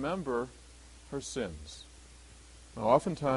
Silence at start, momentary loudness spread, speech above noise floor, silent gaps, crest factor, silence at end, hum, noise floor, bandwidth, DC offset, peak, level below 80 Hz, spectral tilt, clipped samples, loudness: 0 s; 26 LU; 22 dB; none; 24 dB; 0 s; none; -54 dBFS; 11.5 kHz; under 0.1%; -12 dBFS; -54 dBFS; -5.5 dB/octave; under 0.1%; -33 LUFS